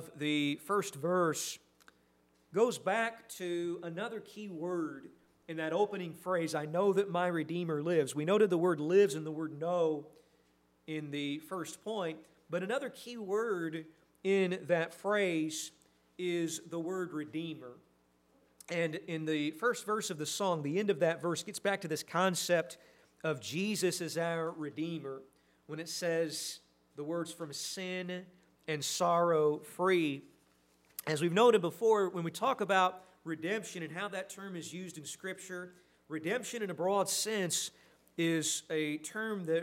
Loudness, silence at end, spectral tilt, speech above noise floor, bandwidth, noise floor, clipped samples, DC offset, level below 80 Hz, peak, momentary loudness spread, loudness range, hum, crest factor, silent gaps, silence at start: -34 LUFS; 0 s; -4 dB/octave; 37 dB; 16 kHz; -71 dBFS; under 0.1%; under 0.1%; -84 dBFS; -14 dBFS; 14 LU; 8 LU; none; 20 dB; none; 0 s